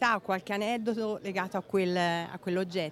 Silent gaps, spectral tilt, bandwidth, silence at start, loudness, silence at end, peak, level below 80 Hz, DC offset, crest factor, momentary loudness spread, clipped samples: none; -5.5 dB/octave; 15 kHz; 0 s; -31 LUFS; 0 s; -12 dBFS; -72 dBFS; under 0.1%; 18 dB; 6 LU; under 0.1%